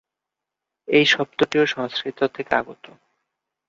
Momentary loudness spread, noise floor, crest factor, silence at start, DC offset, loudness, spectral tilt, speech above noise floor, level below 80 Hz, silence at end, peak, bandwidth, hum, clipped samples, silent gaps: 10 LU; -85 dBFS; 20 dB; 0.9 s; under 0.1%; -20 LUFS; -4 dB/octave; 64 dB; -64 dBFS; 0.95 s; -2 dBFS; 7.6 kHz; none; under 0.1%; none